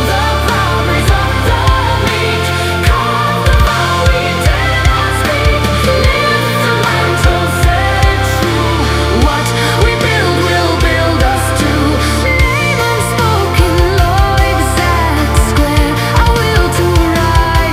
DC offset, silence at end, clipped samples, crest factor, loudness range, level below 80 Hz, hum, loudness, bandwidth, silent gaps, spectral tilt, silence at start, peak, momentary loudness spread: under 0.1%; 0 s; 0.2%; 10 dB; 1 LU; -16 dBFS; none; -11 LUFS; 16 kHz; none; -5 dB/octave; 0 s; 0 dBFS; 2 LU